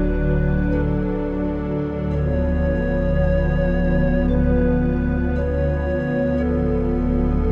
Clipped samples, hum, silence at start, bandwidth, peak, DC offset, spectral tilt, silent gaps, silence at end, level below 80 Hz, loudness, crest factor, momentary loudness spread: under 0.1%; none; 0 s; 4.3 kHz; -6 dBFS; under 0.1%; -10.5 dB/octave; none; 0 s; -24 dBFS; -21 LUFS; 12 dB; 4 LU